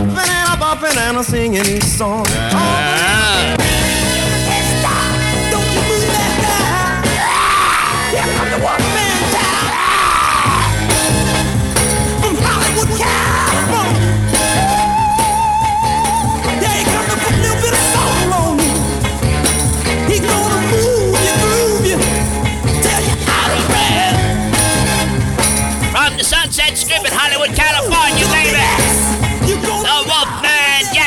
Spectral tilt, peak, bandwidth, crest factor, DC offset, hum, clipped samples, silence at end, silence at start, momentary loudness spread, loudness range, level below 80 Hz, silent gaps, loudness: -3 dB/octave; 0 dBFS; over 20 kHz; 14 dB; under 0.1%; none; under 0.1%; 0 s; 0 s; 4 LU; 2 LU; -26 dBFS; none; -13 LUFS